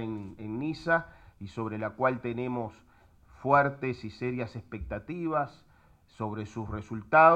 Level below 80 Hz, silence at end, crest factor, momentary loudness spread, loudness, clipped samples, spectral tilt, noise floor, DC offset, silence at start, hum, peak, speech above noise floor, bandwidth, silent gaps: -56 dBFS; 0 s; 22 dB; 14 LU; -31 LUFS; under 0.1%; -8 dB/octave; -58 dBFS; under 0.1%; 0 s; none; -8 dBFS; 29 dB; 8.8 kHz; none